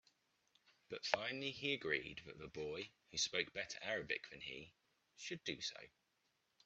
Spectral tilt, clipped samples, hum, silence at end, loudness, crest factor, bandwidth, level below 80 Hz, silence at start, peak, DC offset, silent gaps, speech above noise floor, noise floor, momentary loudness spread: -2 dB/octave; under 0.1%; none; 0.8 s; -44 LUFS; 30 dB; 8.2 kHz; -76 dBFS; 0.9 s; -16 dBFS; under 0.1%; none; 38 dB; -83 dBFS; 14 LU